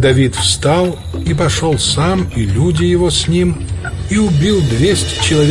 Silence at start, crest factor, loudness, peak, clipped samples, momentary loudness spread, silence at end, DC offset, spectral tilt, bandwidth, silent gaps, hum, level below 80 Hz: 0 s; 12 dB; -14 LUFS; 0 dBFS; under 0.1%; 6 LU; 0 s; under 0.1%; -5 dB/octave; 11.5 kHz; none; none; -28 dBFS